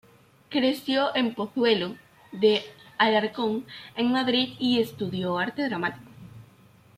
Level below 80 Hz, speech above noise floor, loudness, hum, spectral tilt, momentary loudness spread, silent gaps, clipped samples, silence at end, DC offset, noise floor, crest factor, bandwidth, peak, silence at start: -68 dBFS; 30 dB; -26 LUFS; none; -5.5 dB/octave; 11 LU; none; under 0.1%; 0.55 s; under 0.1%; -55 dBFS; 20 dB; 15 kHz; -8 dBFS; 0.5 s